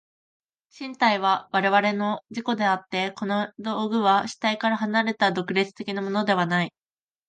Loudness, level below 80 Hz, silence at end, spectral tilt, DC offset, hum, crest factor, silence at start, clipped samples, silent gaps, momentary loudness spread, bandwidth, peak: -24 LUFS; -74 dBFS; 0.6 s; -5 dB/octave; under 0.1%; none; 18 dB; 0.75 s; under 0.1%; none; 8 LU; 9.2 kHz; -6 dBFS